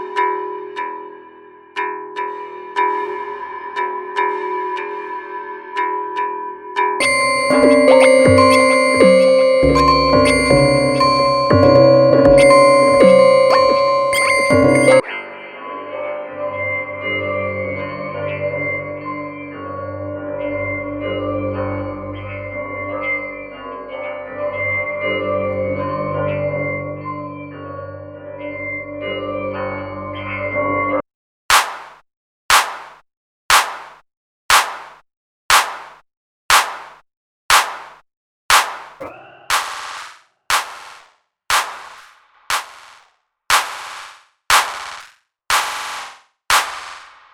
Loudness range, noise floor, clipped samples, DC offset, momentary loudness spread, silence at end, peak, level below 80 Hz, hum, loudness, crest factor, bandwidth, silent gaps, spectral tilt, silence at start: 13 LU; -58 dBFS; under 0.1%; under 0.1%; 20 LU; 0.25 s; 0 dBFS; -42 dBFS; none; -16 LUFS; 18 dB; 17.5 kHz; 31.14-31.49 s, 32.17-32.49 s, 33.17-33.49 s, 34.17-34.49 s, 35.17-35.49 s, 36.17-36.49 s, 37.17-37.49 s, 38.17-38.49 s; -4 dB/octave; 0 s